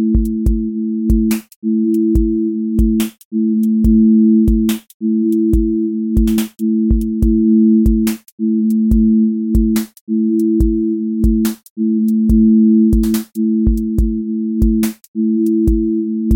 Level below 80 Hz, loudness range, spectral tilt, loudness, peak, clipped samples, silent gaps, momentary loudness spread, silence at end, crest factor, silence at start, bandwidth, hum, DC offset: -22 dBFS; 2 LU; -8 dB/octave; -15 LUFS; -2 dBFS; under 0.1%; 1.56-1.62 s, 3.25-3.31 s, 4.94-5.00 s, 8.32-8.38 s, 10.01-10.07 s, 11.70-11.76 s, 15.08-15.14 s; 8 LU; 0 s; 12 dB; 0 s; 17 kHz; none; under 0.1%